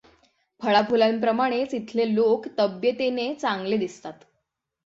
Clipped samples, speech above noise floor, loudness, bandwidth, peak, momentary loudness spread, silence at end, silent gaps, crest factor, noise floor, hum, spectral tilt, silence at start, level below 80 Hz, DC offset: under 0.1%; 54 dB; -24 LUFS; 7.8 kHz; -6 dBFS; 8 LU; 0.75 s; none; 20 dB; -78 dBFS; none; -5.5 dB/octave; 0.6 s; -68 dBFS; under 0.1%